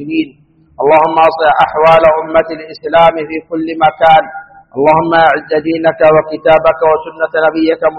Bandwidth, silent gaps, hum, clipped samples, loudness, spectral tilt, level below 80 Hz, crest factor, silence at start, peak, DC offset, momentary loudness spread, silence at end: 5.8 kHz; none; none; 0.2%; -10 LUFS; -7 dB/octave; -42 dBFS; 10 dB; 0 s; 0 dBFS; 0.2%; 12 LU; 0 s